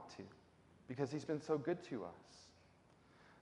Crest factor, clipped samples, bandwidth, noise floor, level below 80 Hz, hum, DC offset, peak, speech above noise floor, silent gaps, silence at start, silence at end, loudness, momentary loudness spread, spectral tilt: 22 dB; under 0.1%; 11.5 kHz; -69 dBFS; -80 dBFS; none; under 0.1%; -24 dBFS; 26 dB; none; 0 s; 0 s; -44 LUFS; 24 LU; -6.5 dB/octave